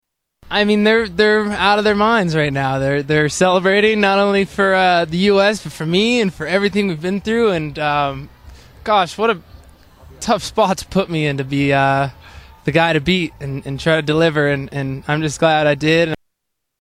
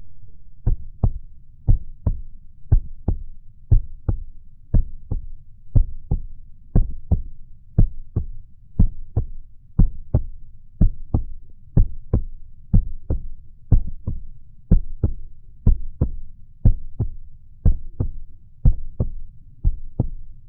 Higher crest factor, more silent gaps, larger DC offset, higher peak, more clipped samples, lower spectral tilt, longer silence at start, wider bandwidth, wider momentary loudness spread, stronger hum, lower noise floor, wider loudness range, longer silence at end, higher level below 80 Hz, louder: about the same, 16 dB vs 20 dB; neither; second, under 0.1% vs 0.4%; about the same, 0 dBFS vs 0 dBFS; neither; second, -5 dB/octave vs -16 dB/octave; first, 0.45 s vs 0 s; first, 14.5 kHz vs 1.5 kHz; second, 8 LU vs 15 LU; neither; first, -75 dBFS vs -39 dBFS; first, 5 LU vs 2 LU; first, 0.65 s vs 0 s; second, -44 dBFS vs -22 dBFS; first, -16 LUFS vs -25 LUFS